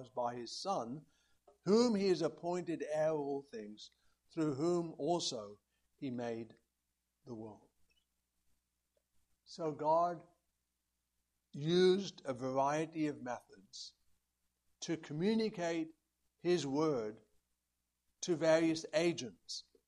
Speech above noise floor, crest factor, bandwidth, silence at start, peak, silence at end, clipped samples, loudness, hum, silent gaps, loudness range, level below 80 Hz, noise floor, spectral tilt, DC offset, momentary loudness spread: 50 dB; 20 dB; 11.5 kHz; 0 s; -18 dBFS; 0.25 s; under 0.1%; -37 LUFS; none; none; 10 LU; -80 dBFS; -87 dBFS; -5.5 dB/octave; under 0.1%; 19 LU